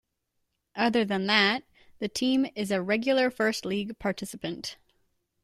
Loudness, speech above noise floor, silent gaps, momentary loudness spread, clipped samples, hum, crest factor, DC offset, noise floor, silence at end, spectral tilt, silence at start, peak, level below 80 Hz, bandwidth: -27 LUFS; 52 dB; none; 13 LU; under 0.1%; none; 22 dB; under 0.1%; -79 dBFS; 0.7 s; -4 dB/octave; 0.75 s; -6 dBFS; -64 dBFS; 14.5 kHz